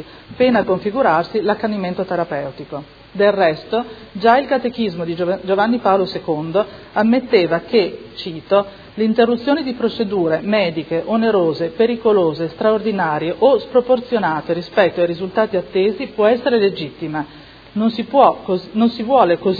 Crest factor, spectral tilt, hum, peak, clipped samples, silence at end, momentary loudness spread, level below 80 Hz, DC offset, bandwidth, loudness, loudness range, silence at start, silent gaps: 16 dB; -8 dB/octave; none; 0 dBFS; under 0.1%; 0 s; 9 LU; -52 dBFS; under 0.1%; 5 kHz; -17 LUFS; 2 LU; 0 s; none